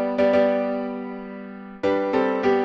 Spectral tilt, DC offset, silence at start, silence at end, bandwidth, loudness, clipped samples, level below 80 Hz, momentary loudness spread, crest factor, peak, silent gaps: -7 dB/octave; under 0.1%; 0 s; 0 s; 7.2 kHz; -22 LUFS; under 0.1%; -58 dBFS; 17 LU; 14 dB; -8 dBFS; none